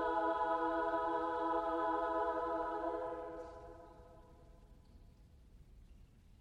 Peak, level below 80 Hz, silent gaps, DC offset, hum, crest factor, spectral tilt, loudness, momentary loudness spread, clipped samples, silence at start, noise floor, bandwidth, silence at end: -24 dBFS; -62 dBFS; none; under 0.1%; none; 16 dB; -6.5 dB/octave; -38 LUFS; 19 LU; under 0.1%; 0 s; -61 dBFS; 10 kHz; 0.05 s